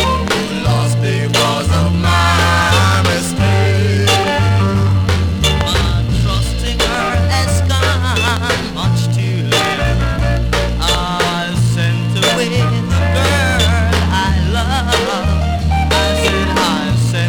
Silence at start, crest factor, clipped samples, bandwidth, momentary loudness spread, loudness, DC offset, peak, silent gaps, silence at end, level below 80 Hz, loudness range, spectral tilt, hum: 0 s; 14 dB; under 0.1%; 18.5 kHz; 4 LU; -14 LUFS; under 0.1%; 0 dBFS; none; 0 s; -22 dBFS; 2 LU; -5 dB/octave; none